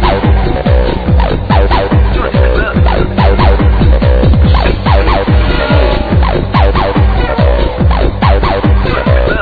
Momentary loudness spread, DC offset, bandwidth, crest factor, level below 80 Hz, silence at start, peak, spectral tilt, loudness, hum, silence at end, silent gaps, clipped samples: 2 LU; under 0.1%; 4.9 kHz; 8 dB; -10 dBFS; 0 s; 0 dBFS; -9.5 dB/octave; -10 LUFS; none; 0 s; none; 0.6%